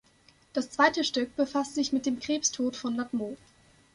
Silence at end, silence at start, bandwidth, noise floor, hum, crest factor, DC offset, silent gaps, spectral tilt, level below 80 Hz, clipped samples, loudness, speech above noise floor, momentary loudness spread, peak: 0.6 s; 0.55 s; 11.5 kHz; -62 dBFS; none; 22 dB; under 0.1%; none; -2 dB/octave; -66 dBFS; under 0.1%; -29 LUFS; 33 dB; 10 LU; -8 dBFS